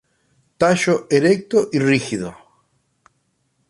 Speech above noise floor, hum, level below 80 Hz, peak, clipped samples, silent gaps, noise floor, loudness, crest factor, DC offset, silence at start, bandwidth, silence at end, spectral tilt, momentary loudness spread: 50 dB; none; -58 dBFS; 0 dBFS; under 0.1%; none; -67 dBFS; -18 LUFS; 20 dB; under 0.1%; 0.6 s; 11.5 kHz; 1.35 s; -5.5 dB/octave; 10 LU